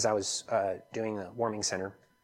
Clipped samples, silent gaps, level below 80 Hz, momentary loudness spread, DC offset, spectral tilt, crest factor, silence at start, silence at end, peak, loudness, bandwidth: under 0.1%; none; -72 dBFS; 6 LU; under 0.1%; -3 dB/octave; 18 dB; 0 s; 0.3 s; -16 dBFS; -33 LUFS; 16 kHz